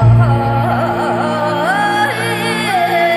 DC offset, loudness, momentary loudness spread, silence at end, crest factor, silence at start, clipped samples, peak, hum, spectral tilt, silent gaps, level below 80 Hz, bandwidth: under 0.1%; -14 LUFS; 4 LU; 0 s; 12 dB; 0 s; under 0.1%; -2 dBFS; none; -6 dB/octave; none; -34 dBFS; 13 kHz